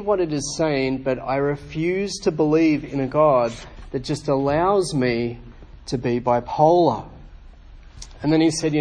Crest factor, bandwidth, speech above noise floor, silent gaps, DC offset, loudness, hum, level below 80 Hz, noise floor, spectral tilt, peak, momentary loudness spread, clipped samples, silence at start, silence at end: 18 dB; 10.5 kHz; 23 dB; none; under 0.1%; -21 LUFS; none; -44 dBFS; -43 dBFS; -6 dB/octave; -4 dBFS; 13 LU; under 0.1%; 0 s; 0 s